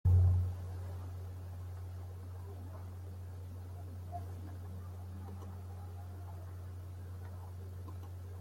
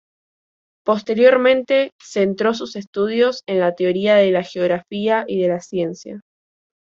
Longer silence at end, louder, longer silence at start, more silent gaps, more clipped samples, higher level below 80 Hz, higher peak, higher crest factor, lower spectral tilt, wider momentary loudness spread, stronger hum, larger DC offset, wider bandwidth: second, 0 s vs 0.75 s; second, -42 LUFS vs -18 LUFS; second, 0.05 s vs 0.85 s; second, none vs 1.92-1.99 s, 2.87-2.93 s; neither; first, -58 dBFS vs -64 dBFS; second, -20 dBFS vs -2 dBFS; about the same, 20 dB vs 16 dB; first, -8 dB/octave vs -5.5 dB/octave; second, 7 LU vs 12 LU; neither; neither; first, 11 kHz vs 7.6 kHz